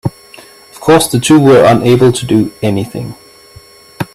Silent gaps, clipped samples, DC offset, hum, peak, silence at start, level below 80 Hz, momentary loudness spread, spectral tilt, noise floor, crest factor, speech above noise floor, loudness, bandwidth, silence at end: none; under 0.1%; under 0.1%; none; 0 dBFS; 0.05 s; -44 dBFS; 17 LU; -5.5 dB/octave; -38 dBFS; 10 dB; 30 dB; -9 LUFS; 15.5 kHz; 0.1 s